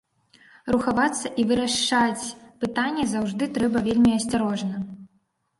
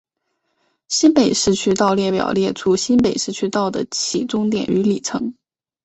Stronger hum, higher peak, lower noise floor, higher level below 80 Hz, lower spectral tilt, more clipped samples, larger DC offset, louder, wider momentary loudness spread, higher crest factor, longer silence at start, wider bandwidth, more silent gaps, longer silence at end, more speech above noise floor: neither; second, -6 dBFS vs -2 dBFS; second, -68 dBFS vs -72 dBFS; about the same, -52 dBFS vs -52 dBFS; about the same, -4 dB/octave vs -4 dB/octave; neither; neither; second, -23 LUFS vs -18 LUFS; first, 12 LU vs 7 LU; about the same, 18 dB vs 16 dB; second, 0.65 s vs 0.9 s; first, 11.5 kHz vs 8.2 kHz; neither; about the same, 0.55 s vs 0.5 s; second, 45 dB vs 54 dB